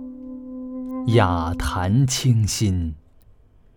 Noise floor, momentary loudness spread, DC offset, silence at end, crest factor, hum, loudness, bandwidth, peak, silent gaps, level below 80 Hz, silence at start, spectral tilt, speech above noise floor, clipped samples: -51 dBFS; 17 LU; under 0.1%; 0.75 s; 18 dB; none; -21 LUFS; 18.5 kHz; -4 dBFS; none; -38 dBFS; 0 s; -5.5 dB/octave; 32 dB; under 0.1%